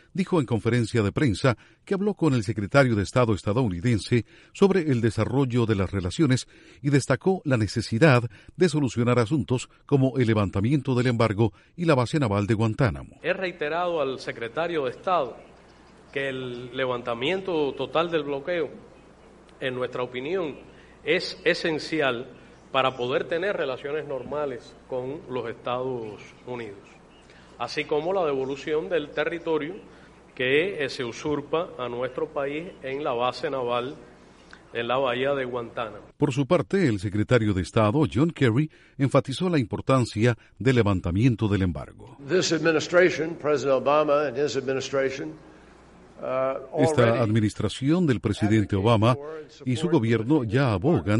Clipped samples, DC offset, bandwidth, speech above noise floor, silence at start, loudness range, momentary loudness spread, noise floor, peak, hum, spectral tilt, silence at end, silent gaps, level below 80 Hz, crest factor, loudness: under 0.1%; under 0.1%; 11.5 kHz; 27 dB; 0.15 s; 6 LU; 11 LU; -52 dBFS; -4 dBFS; none; -6.5 dB/octave; 0 s; none; -52 dBFS; 20 dB; -25 LUFS